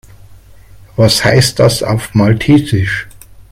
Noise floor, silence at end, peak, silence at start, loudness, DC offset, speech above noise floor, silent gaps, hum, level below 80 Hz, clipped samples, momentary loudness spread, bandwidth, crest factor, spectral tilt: -37 dBFS; 0.1 s; 0 dBFS; 0.3 s; -11 LUFS; under 0.1%; 27 dB; none; none; -36 dBFS; under 0.1%; 11 LU; 16 kHz; 12 dB; -5 dB/octave